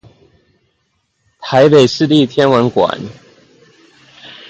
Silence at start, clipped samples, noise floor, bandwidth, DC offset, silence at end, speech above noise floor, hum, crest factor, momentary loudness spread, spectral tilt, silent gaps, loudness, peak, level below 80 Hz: 1.4 s; under 0.1%; -64 dBFS; 8.8 kHz; under 0.1%; 0.2 s; 54 dB; none; 14 dB; 18 LU; -6 dB/octave; none; -11 LUFS; 0 dBFS; -54 dBFS